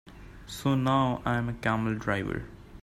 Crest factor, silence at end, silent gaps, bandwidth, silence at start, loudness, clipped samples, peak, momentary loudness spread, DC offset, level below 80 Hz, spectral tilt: 18 dB; 0 s; none; 15.5 kHz; 0.05 s; -29 LUFS; under 0.1%; -12 dBFS; 16 LU; under 0.1%; -50 dBFS; -6.5 dB/octave